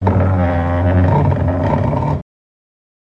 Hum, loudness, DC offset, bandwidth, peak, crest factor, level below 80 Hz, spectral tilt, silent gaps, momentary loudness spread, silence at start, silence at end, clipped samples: none; -16 LUFS; under 0.1%; 5 kHz; -2 dBFS; 12 dB; -32 dBFS; -10 dB/octave; none; 5 LU; 0 s; 0.95 s; under 0.1%